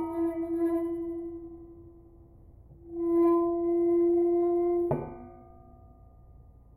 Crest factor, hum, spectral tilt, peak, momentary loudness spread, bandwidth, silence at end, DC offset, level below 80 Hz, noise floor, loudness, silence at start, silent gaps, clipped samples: 14 dB; none; -11 dB/octave; -16 dBFS; 21 LU; 2.5 kHz; 0.35 s; under 0.1%; -56 dBFS; -53 dBFS; -28 LUFS; 0 s; none; under 0.1%